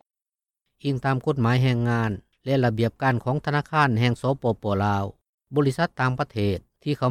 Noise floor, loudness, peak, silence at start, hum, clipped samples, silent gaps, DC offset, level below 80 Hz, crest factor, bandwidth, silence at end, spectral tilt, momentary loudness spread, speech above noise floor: under -90 dBFS; -24 LUFS; -8 dBFS; 0.85 s; none; under 0.1%; 5.29-5.38 s; under 0.1%; -54 dBFS; 16 dB; 12.5 kHz; 0 s; -7.5 dB/octave; 8 LU; over 67 dB